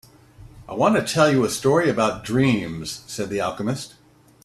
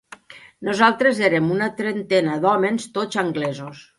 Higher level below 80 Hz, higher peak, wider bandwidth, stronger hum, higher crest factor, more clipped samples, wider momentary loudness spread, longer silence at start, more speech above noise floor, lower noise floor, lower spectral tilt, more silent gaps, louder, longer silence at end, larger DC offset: first, -52 dBFS vs -66 dBFS; about the same, -4 dBFS vs -2 dBFS; first, 14 kHz vs 11.5 kHz; neither; about the same, 18 dB vs 18 dB; neither; first, 13 LU vs 10 LU; about the same, 0.4 s vs 0.3 s; about the same, 25 dB vs 24 dB; about the same, -46 dBFS vs -44 dBFS; about the same, -5 dB/octave vs -5.5 dB/octave; neither; about the same, -21 LUFS vs -20 LUFS; first, 0.55 s vs 0.15 s; neither